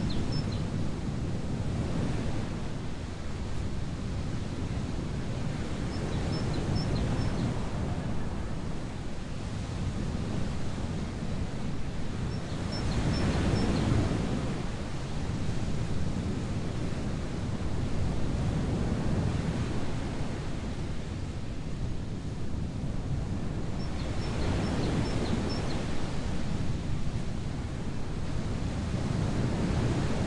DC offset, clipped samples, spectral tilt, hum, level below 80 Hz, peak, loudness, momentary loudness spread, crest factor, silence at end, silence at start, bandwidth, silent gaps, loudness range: under 0.1%; under 0.1%; -6.5 dB/octave; none; -38 dBFS; -14 dBFS; -33 LUFS; 7 LU; 16 dB; 0 s; 0 s; 11 kHz; none; 5 LU